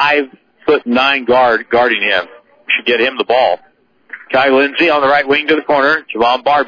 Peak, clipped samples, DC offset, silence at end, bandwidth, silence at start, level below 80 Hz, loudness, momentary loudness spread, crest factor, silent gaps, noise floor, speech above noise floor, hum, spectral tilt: 0 dBFS; under 0.1%; under 0.1%; 0 s; 5.4 kHz; 0 s; -52 dBFS; -12 LUFS; 7 LU; 12 dB; none; -36 dBFS; 24 dB; none; -5 dB/octave